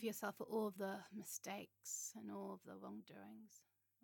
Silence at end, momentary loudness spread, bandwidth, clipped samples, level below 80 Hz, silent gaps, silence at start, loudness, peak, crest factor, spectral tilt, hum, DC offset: 0.45 s; 15 LU; 17.5 kHz; under 0.1%; under -90 dBFS; none; 0 s; -49 LUFS; -32 dBFS; 18 dB; -3.5 dB/octave; none; under 0.1%